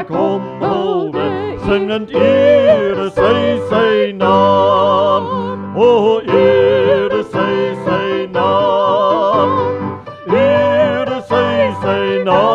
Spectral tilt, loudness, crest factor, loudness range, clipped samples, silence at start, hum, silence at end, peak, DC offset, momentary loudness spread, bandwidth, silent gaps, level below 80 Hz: -7 dB/octave; -13 LUFS; 12 dB; 2 LU; under 0.1%; 0 s; none; 0 s; 0 dBFS; under 0.1%; 8 LU; 7.6 kHz; none; -46 dBFS